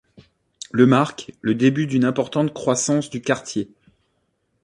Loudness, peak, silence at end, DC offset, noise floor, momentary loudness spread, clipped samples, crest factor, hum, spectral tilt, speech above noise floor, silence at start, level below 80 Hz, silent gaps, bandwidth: -20 LUFS; -2 dBFS; 1 s; under 0.1%; -70 dBFS; 12 LU; under 0.1%; 20 dB; none; -5.5 dB/octave; 50 dB; 0.75 s; -60 dBFS; none; 11 kHz